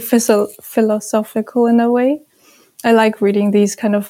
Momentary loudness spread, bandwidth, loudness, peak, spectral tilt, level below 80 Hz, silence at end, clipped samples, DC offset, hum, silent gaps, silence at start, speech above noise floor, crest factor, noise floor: 7 LU; 16.5 kHz; -15 LUFS; 0 dBFS; -5 dB/octave; -68 dBFS; 0 s; under 0.1%; under 0.1%; none; none; 0 s; 36 dB; 14 dB; -51 dBFS